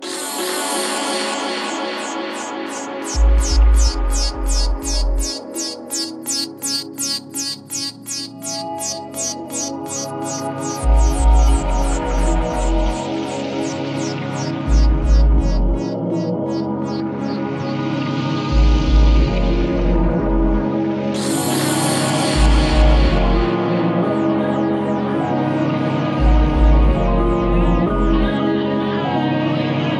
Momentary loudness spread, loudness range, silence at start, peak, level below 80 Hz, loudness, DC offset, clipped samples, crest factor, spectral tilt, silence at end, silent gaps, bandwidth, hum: 8 LU; 5 LU; 0 s; -2 dBFS; -20 dBFS; -19 LUFS; under 0.1%; under 0.1%; 14 dB; -5 dB/octave; 0 s; none; 13.5 kHz; none